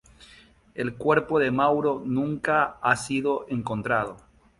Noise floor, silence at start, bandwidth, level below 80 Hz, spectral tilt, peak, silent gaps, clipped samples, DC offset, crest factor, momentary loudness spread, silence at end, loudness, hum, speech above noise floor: -54 dBFS; 0.2 s; 11.5 kHz; -56 dBFS; -6 dB/octave; -6 dBFS; none; under 0.1%; under 0.1%; 20 dB; 9 LU; 0.4 s; -25 LUFS; none; 29 dB